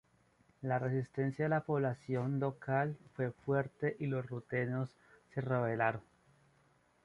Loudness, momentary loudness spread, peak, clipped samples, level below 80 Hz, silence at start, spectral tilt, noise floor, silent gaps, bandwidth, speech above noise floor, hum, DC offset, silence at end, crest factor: -37 LUFS; 7 LU; -16 dBFS; under 0.1%; -72 dBFS; 0.6 s; -9.5 dB/octave; -71 dBFS; none; 9.8 kHz; 35 dB; none; under 0.1%; 1.05 s; 20 dB